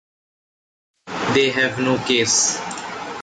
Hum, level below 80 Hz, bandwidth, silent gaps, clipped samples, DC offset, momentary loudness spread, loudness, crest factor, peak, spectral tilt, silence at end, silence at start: none; -58 dBFS; 9.4 kHz; none; under 0.1%; under 0.1%; 13 LU; -18 LUFS; 16 dB; -6 dBFS; -2 dB/octave; 0 s; 1.05 s